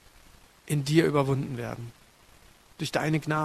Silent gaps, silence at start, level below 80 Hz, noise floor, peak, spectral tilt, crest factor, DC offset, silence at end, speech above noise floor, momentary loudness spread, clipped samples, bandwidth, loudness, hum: none; 0.65 s; -58 dBFS; -56 dBFS; -8 dBFS; -6 dB/octave; 22 dB; under 0.1%; 0 s; 29 dB; 14 LU; under 0.1%; 14 kHz; -27 LUFS; none